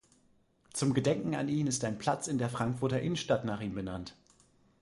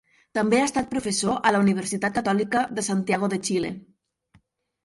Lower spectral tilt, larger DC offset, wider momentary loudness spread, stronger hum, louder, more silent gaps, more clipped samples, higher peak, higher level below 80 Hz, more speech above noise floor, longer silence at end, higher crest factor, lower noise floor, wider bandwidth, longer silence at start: about the same, -5.5 dB/octave vs -4.5 dB/octave; neither; first, 9 LU vs 6 LU; neither; second, -33 LUFS vs -24 LUFS; neither; neither; second, -14 dBFS vs -6 dBFS; about the same, -60 dBFS vs -58 dBFS; about the same, 36 dB vs 39 dB; second, 0.7 s vs 1.05 s; about the same, 20 dB vs 18 dB; first, -68 dBFS vs -62 dBFS; about the same, 11.5 kHz vs 11.5 kHz; first, 0.75 s vs 0.35 s